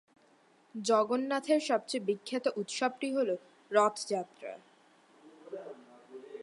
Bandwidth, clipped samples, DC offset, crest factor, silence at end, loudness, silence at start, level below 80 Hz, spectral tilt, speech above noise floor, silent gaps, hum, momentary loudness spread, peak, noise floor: 11.5 kHz; under 0.1%; under 0.1%; 22 dB; 0 s; -32 LUFS; 0.75 s; -90 dBFS; -3.5 dB/octave; 34 dB; none; none; 20 LU; -12 dBFS; -65 dBFS